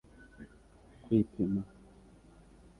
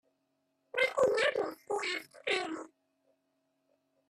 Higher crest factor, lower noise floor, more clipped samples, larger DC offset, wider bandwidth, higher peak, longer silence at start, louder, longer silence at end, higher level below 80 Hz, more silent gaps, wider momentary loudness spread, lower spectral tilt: about the same, 22 dB vs 18 dB; second, -59 dBFS vs -79 dBFS; neither; neither; second, 11 kHz vs 14 kHz; about the same, -16 dBFS vs -18 dBFS; second, 0.4 s vs 0.75 s; about the same, -33 LUFS vs -32 LUFS; second, 1.15 s vs 1.4 s; first, -58 dBFS vs -78 dBFS; neither; first, 24 LU vs 11 LU; first, -10 dB/octave vs -2.5 dB/octave